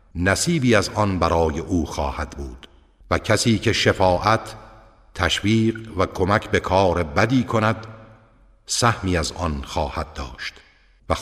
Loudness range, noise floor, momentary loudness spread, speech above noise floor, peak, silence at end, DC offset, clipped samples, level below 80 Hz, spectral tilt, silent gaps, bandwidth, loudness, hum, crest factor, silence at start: 3 LU; -53 dBFS; 13 LU; 32 dB; -2 dBFS; 0 s; under 0.1%; under 0.1%; -38 dBFS; -5 dB/octave; none; 15 kHz; -21 LUFS; none; 18 dB; 0.15 s